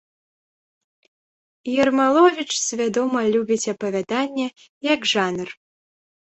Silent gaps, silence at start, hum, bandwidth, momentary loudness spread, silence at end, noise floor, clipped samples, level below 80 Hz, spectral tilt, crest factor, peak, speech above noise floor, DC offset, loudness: 4.69-4.81 s; 1.65 s; none; 8.4 kHz; 12 LU; 0.65 s; under -90 dBFS; under 0.1%; -66 dBFS; -3 dB/octave; 20 dB; -4 dBFS; over 70 dB; under 0.1%; -21 LUFS